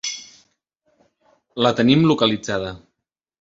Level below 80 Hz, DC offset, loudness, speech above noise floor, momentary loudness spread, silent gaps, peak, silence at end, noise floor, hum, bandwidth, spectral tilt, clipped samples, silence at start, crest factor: -54 dBFS; under 0.1%; -18 LUFS; 61 dB; 18 LU; none; -2 dBFS; 0.65 s; -79 dBFS; none; 7.8 kHz; -5 dB/octave; under 0.1%; 0.05 s; 20 dB